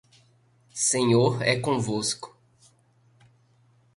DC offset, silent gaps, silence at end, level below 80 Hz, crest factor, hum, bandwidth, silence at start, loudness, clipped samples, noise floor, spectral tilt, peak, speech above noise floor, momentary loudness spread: under 0.1%; none; 1.7 s; -62 dBFS; 20 dB; none; 11.5 kHz; 0.75 s; -24 LUFS; under 0.1%; -62 dBFS; -4 dB/octave; -8 dBFS; 38 dB; 15 LU